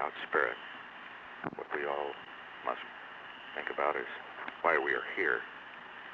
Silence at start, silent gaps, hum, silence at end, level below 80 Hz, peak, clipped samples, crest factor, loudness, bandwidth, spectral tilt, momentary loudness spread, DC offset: 0 s; none; 60 Hz at -75 dBFS; 0 s; -76 dBFS; -14 dBFS; under 0.1%; 22 dB; -35 LUFS; 7.2 kHz; -5.5 dB/octave; 16 LU; under 0.1%